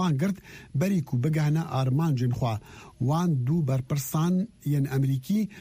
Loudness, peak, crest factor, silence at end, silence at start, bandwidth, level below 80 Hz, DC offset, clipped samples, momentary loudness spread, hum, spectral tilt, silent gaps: -27 LUFS; -16 dBFS; 10 dB; 0 s; 0 s; 15.5 kHz; -56 dBFS; under 0.1%; under 0.1%; 5 LU; none; -7.5 dB/octave; none